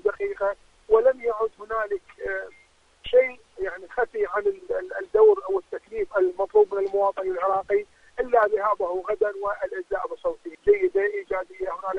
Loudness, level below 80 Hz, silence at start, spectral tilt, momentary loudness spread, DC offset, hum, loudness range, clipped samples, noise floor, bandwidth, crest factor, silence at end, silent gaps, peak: -25 LUFS; -54 dBFS; 0.05 s; -5.5 dB/octave; 11 LU; under 0.1%; none; 4 LU; under 0.1%; -58 dBFS; 6 kHz; 18 dB; 0 s; none; -6 dBFS